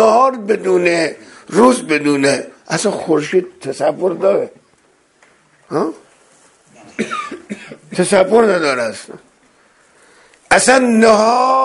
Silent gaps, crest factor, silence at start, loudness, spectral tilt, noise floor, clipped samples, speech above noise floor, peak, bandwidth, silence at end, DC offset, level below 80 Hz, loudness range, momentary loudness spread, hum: none; 16 dB; 0 s; -14 LUFS; -4 dB/octave; -55 dBFS; under 0.1%; 41 dB; 0 dBFS; 11.5 kHz; 0 s; under 0.1%; -56 dBFS; 9 LU; 16 LU; none